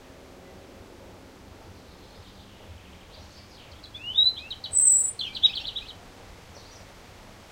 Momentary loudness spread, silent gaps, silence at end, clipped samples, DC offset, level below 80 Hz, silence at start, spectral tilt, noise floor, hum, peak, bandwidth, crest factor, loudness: 29 LU; none; 0.3 s; under 0.1%; under 0.1%; -54 dBFS; 0.45 s; 1 dB/octave; -48 dBFS; none; -8 dBFS; 16 kHz; 24 dB; -21 LUFS